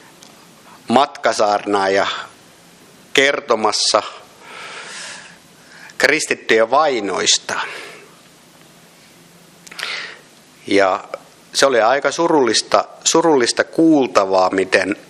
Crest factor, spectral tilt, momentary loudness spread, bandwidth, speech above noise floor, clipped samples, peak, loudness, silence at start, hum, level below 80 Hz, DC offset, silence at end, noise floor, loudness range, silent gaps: 18 dB; -2 dB/octave; 19 LU; 14 kHz; 31 dB; under 0.1%; 0 dBFS; -16 LUFS; 0.9 s; none; -64 dBFS; under 0.1%; 0.1 s; -46 dBFS; 9 LU; none